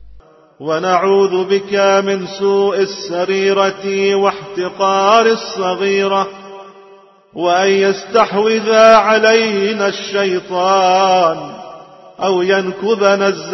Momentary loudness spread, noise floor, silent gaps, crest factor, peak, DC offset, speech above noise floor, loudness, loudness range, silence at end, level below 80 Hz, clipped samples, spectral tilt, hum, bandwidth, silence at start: 10 LU; -44 dBFS; none; 14 dB; 0 dBFS; under 0.1%; 31 dB; -13 LUFS; 4 LU; 0 s; -56 dBFS; under 0.1%; -4 dB/octave; none; 6.2 kHz; 0 s